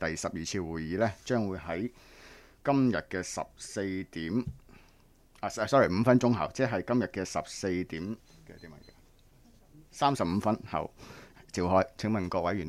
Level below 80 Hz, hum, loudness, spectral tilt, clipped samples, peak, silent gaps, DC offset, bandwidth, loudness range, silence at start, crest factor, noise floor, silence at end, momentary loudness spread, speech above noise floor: -56 dBFS; none; -31 LUFS; -6 dB/octave; under 0.1%; -10 dBFS; none; under 0.1%; 14 kHz; 6 LU; 0 s; 20 dB; -61 dBFS; 0 s; 17 LU; 30 dB